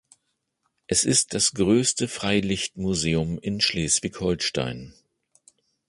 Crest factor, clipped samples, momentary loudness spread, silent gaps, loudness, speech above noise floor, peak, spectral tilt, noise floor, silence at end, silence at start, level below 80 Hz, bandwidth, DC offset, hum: 18 dB; under 0.1%; 7 LU; none; -23 LUFS; 52 dB; -6 dBFS; -3.5 dB/octave; -76 dBFS; 1 s; 0.9 s; -48 dBFS; 11.5 kHz; under 0.1%; none